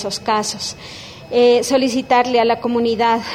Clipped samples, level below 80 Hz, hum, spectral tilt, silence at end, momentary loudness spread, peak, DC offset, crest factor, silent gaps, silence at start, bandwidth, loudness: under 0.1%; -52 dBFS; none; -3.5 dB/octave; 0 s; 13 LU; -2 dBFS; under 0.1%; 16 dB; none; 0 s; 15 kHz; -16 LUFS